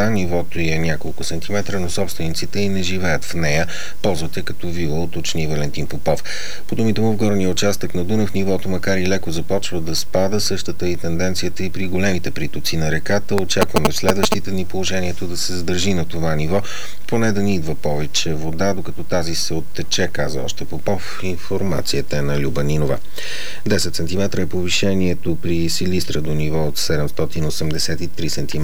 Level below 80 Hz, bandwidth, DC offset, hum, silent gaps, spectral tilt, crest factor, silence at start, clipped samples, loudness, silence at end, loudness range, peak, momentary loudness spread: -38 dBFS; over 20 kHz; 20%; none; none; -4.5 dB/octave; 22 dB; 0 s; under 0.1%; -21 LUFS; 0 s; 3 LU; 0 dBFS; 6 LU